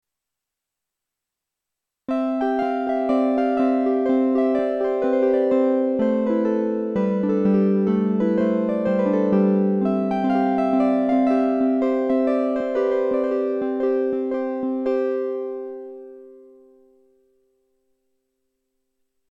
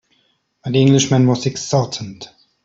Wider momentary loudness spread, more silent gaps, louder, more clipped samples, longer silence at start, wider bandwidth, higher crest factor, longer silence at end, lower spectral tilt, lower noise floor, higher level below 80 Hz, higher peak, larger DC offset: second, 6 LU vs 20 LU; neither; second, -21 LUFS vs -16 LUFS; neither; first, 2.1 s vs 0.65 s; second, 5.6 kHz vs 7.8 kHz; about the same, 14 dB vs 16 dB; first, 3 s vs 0.4 s; first, -9.5 dB/octave vs -5.5 dB/octave; first, -85 dBFS vs -63 dBFS; second, -62 dBFS vs -56 dBFS; second, -8 dBFS vs -2 dBFS; neither